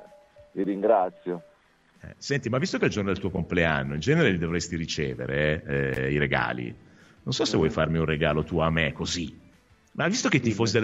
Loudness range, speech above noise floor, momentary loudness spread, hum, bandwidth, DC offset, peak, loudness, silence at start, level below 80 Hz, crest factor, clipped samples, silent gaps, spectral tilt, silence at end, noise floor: 2 LU; 35 dB; 11 LU; none; 8.2 kHz; under 0.1%; -6 dBFS; -26 LUFS; 0 s; -46 dBFS; 20 dB; under 0.1%; none; -5 dB/octave; 0 s; -61 dBFS